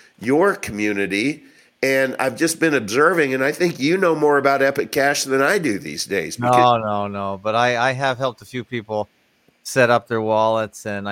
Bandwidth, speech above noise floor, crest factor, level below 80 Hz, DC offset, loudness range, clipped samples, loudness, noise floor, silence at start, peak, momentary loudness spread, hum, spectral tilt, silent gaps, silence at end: 17 kHz; 37 dB; 18 dB; -60 dBFS; under 0.1%; 3 LU; under 0.1%; -19 LUFS; -56 dBFS; 0.2 s; 0 dBFS; 10 LU; none; -4.5 dB/octave; none; 0 s